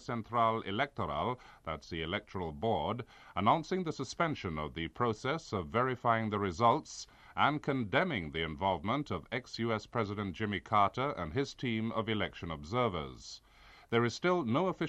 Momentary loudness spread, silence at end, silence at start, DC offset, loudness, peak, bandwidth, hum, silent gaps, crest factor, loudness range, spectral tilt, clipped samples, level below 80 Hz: 11 LU; 0 s; 0 s; under 0.1%; -34 LUFS; -14 dBFS; 9.4 kHz; none; none; 20 dB; 3 LU; -6 dB/octave; under 0.1%; -58 dBFS